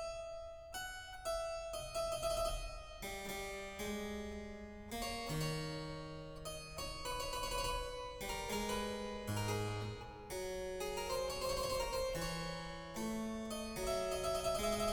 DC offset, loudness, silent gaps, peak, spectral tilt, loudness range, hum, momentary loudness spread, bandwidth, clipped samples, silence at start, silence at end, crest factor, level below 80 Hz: under 0.1%; -42 LUFS; none; -26 dBFS; -4 dB/octave; 3 LU; none; 9 LU; 19 kHz; under 0.1%; 0 s; 0 s; 16 dB; -52 dBFS